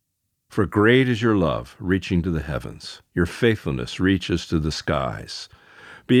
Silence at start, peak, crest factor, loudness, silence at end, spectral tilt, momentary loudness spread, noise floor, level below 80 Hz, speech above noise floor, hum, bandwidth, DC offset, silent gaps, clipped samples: 0.5 s; -2 dBFS; 20 dB; -22 LUFS; 0 s; -6.5 dB/octave; 16 LU; -75 dBFS; -40 dBFS; 53 dB; none; 14.5 kHz; under 0.1%; none; under 0.1%